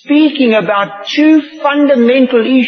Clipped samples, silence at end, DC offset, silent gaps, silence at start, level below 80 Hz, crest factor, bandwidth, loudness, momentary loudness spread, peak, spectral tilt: under 0.1%; 0 s; under 0.1%; none; 0.05 s; -68 dBFS; 10 dB; 6.4 kHz; -10 LUFS; 6 LU; 0 dBFS; -5.5 dB/octave